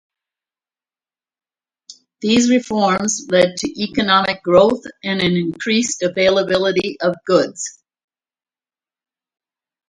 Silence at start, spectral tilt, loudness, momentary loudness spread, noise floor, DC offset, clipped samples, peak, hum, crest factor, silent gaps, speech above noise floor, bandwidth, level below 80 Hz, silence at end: 1.9 s; -4 dB/octave; -17 LUFS; 9 LU; under -90 dBFS; under 0.1%; under 0.1%; 0 dBFS; none; 18 dB; none; over 74 dB; 11.5 kHz; -54 dBFS; 2.2 s